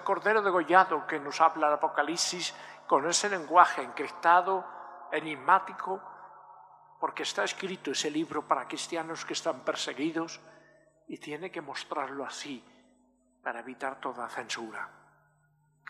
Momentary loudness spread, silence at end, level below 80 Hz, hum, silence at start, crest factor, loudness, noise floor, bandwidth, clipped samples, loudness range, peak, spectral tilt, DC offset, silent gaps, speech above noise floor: 17 LU; 1 s; -86 dBFS; 50 Hz at -65 dBFS; 0 s; 26 dB; -29 LUFS; -69 dBFS; 14.5 kHz; under 0.1%; 13 LU; -4 dBFS; -2 dB/octave; under 0.1%; none; 39 dB